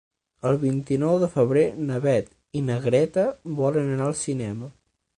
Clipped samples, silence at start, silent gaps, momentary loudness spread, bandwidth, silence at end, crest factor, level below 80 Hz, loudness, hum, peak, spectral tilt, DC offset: under 0.1%; 0.45 s; none; 9 LU; 11 kHz; 0.5 s; 16 dB; -58 dBFS; -24 LUFS; none; -8 dBFS; -7 dB/octave; under 0.1%